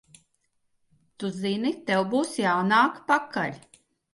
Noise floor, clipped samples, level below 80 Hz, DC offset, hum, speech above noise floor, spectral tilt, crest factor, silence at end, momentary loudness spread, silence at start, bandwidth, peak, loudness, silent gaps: -72 dBFS; under 0.1%; -74 dBFS; under 0.1%; none; 48 dB; -5 dB/octave; 18 dB; 0.55 s; 10 LU; 1.2 s; 11.5 kHz; -8 dBFS; -25 LUFS; none